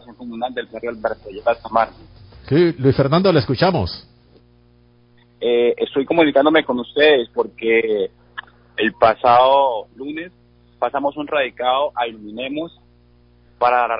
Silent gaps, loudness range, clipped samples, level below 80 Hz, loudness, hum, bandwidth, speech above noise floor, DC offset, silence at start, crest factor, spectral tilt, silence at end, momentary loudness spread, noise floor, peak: none; 6 LU; under 0.1%; -48 dBFS; -18 LUFS; 60 Hz at -45 dBFS; 5.4 kHz; 35 dB; under 0.1%; 0.1 s; 18 dB; -11 dB/octave; 0 s; 15 LU; -53 dBFS; -2 dBFS